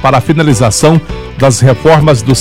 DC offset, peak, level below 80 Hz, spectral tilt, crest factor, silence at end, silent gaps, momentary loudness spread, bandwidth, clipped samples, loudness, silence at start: under 0.1%; 0 dBFS; -28 dBFS; -5.5 dB/octave; 8 dB; 0 s; none; 5 LU; 15.5 kHz; 2%; -8 LUFS; 0 s